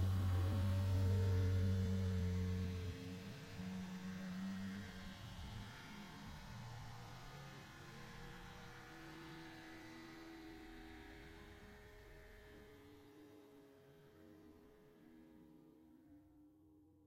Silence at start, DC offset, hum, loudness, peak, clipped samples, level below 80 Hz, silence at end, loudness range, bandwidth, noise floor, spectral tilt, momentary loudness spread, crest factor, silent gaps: 0 s; under 0.1%; none; -45 LUFS; -28 dBFS; under 0.1%; -62 dBFS; 0.25 s; 23 LU; 15.5 kHz; -68 dBFS; -7 dB/octave; 26 LU; 16 dB; none